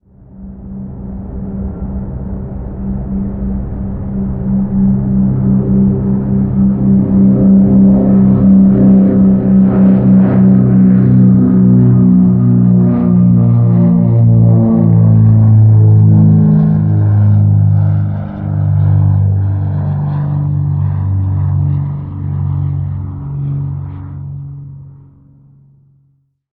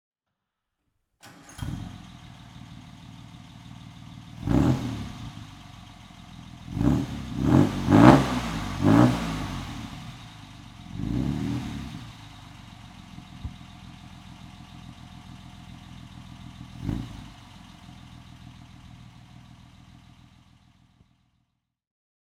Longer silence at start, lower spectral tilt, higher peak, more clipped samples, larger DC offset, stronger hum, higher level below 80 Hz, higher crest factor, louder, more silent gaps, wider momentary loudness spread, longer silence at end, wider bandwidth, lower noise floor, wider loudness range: second, 0.4 s vs 1.25 s; first, -15 dB/octave vs -7 dB/octave; about the same, 0 dBFS vs 0 dBFS; neither; neither; neither; first, -30 dBFS vs -44 dBFS; second, 10 dB vs 28 dB; first, -10 LUFS vs -24 LUFS; neither; second, 15 LU vs 26 LU; second, 1.65 s vs 3.25 s; second, 2.3 kHz vs 15.5 kHz; second, -56 dBFS vs -84 dBFS; second, 13 LU vs 23 LU